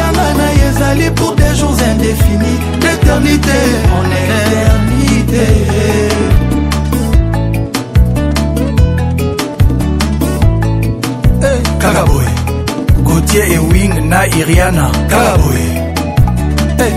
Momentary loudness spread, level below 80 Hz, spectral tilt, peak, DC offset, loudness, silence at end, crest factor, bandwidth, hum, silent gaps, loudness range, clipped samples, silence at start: 4 LU; -16 dBFS; -5.5 dB/octave; 0 dBFS; under 0.1%; -11 LUFS; 0 s; 10 dB; 16.5 kHz; none; none; 2 LU; 0.5%; 0 s